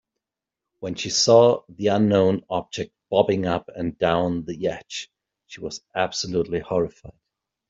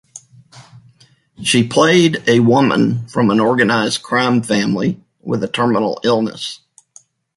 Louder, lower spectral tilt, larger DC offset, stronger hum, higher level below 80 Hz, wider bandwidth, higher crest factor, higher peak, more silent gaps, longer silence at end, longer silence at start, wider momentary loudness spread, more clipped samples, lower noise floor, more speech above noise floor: second, -22 LUFS vs -15 LUFS; about the same, -4.5 dB/octave vs -5 dB/octave; neither; neither; about the same, -56 dBFS vs -54 dBFS; second, 7.8 kHz vs 11.5 kHz; about the same, 20 dB vs 16 dB; second, -4 dBFS vs 0 dBFS; neither; second, 0.6 s vs 0.8 s; first, 0.8 s vs 0.15 s; first, 17 LU vs 11 LU; neither; first, -87 dBFS vs -51 dBFS; first, 65 dB vs 37 dB